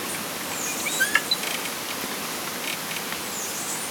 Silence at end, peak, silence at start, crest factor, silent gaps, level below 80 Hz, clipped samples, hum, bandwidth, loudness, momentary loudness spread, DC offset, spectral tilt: 0 s; -2 dBFS; 0 s; 26 dB; none; -66 dBFS; under 0.1%; none; over 20 kHz; -26 LUFS; 7 LU; under 0.1%; -0.5 dB/octave